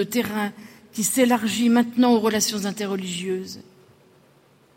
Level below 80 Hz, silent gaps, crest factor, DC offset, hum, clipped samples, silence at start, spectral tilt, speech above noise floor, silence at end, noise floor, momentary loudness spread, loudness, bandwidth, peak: -66 dBFS; none; 16 dB; under 0.1%; none; under 0.1%; 0 s; -3.5 dB/octave; 35 dB; 1.15 s; -57 dBFS; 12 LU; -22 LUFS; 16.5 kHz; -8 dBFS